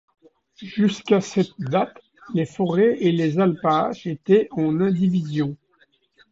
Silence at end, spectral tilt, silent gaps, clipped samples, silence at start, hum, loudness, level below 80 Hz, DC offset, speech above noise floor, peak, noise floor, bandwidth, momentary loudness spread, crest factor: 0.75 s; -7.5 dB/octave; none; under 0.1%; 0.6 s; none; -21 LUFS; -62 dBFS; under 0.1%; 41 dB; -6 dBFS; -62 dBFS; 7.8 kHz; 10 LU; 16 dB